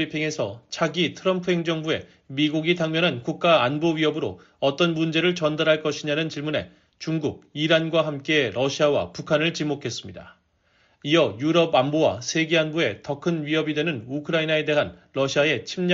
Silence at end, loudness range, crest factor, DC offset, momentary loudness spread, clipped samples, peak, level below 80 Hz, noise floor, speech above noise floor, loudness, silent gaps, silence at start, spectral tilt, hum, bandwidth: 0 s; 2 LU; 18 dB; under 0.1%; 9 LU; under 0.1%; -6 dBFS; -62 dBFS; -64 dBFS; 41 dB; -23 LUFS; none; 0 s; -3.5 dB/octave; none; 7.6 kHz